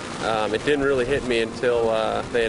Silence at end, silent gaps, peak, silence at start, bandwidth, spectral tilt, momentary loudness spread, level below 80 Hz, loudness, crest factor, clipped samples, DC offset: 0 s; none; -10 dBFS; 0 s; 11 kHz; -4.5 dB/octave; 3 LU; -44 dBFS; -22 LUFS; 12 dB; under 0.1%; under 0.1%